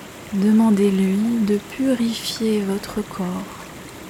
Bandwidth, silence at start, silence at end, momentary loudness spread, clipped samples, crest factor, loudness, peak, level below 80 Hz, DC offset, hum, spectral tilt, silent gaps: 16.5 kHz; 0 s; 0 s; 13 LU; under 0.1%; 14 dB; -20 LUFS; -6 dBFS; -52 dBFS; under 0.1%; none; -6 dB/octave; none